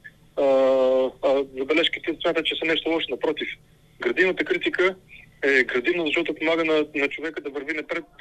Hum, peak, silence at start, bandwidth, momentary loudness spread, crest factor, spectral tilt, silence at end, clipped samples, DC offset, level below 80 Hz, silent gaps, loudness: none; -4 dBFS; 0.05 s; 9.6 kHz; 10 LU; 18 dB; -4.5 dB/octave; 0.15 s; under 0.1%; under 0.1%; -58 dBFS; none; -23 LUFS